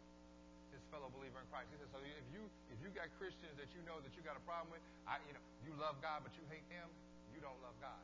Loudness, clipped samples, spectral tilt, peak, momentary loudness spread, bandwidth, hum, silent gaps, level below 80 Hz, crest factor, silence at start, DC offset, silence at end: -53 LUFS; under 0.1%; -5.5 dB/octave; -30 dBFS; 12 LU; 8 kHz; 60 Hz at -65 dBFS; none; -70 dBFS; 24 dB; 0 s; under 0.1%; 0 s